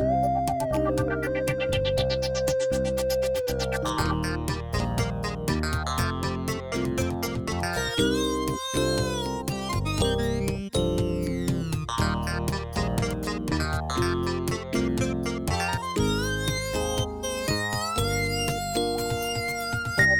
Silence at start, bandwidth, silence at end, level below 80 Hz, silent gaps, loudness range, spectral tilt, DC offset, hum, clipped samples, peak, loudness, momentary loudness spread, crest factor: 0 s; 19 kHz; 0 s; -38 dBFS; none; 2 LU; -5 dB/octave; under 0.1%; none; under 0.1%; -8 dBFS; -27 LUFS; 4 LU; 18 dB